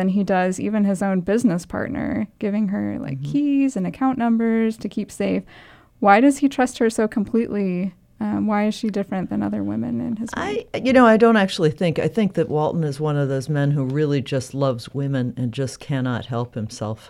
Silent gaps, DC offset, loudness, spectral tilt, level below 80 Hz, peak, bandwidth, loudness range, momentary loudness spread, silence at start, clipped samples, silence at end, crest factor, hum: none; under 0.1%; -21 LUFS; -6.5 dB/octave; -54 dBFS; -2 dBFS; 13.5 kHz; 5 LU; 10 LU; 0 s; under 0.1%; 0 s; 20 dB; none